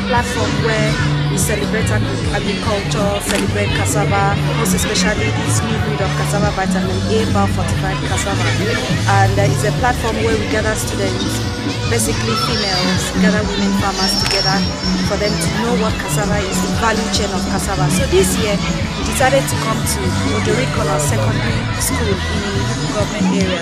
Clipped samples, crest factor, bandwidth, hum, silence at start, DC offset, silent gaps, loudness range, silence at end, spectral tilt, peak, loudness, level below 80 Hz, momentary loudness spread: under 0.1%; 16 dB; 15.5 kHz; none; 0 s; under 0.1%; none; 1 LU; 0 s; -4.5 dB/octave; 0 dBFS; -16 LUFS; -28 dBFS; 4 LU